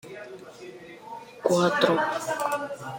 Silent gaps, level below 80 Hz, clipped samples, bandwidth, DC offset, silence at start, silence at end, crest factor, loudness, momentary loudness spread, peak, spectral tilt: none; -70 dBFS; under 0.1%; 16.5 kHz; under 0.1%; 0.05 s; 0 s; 20 dB; -25 LUFS; 21 LU; -6 dBFS; -4.5 dB/octave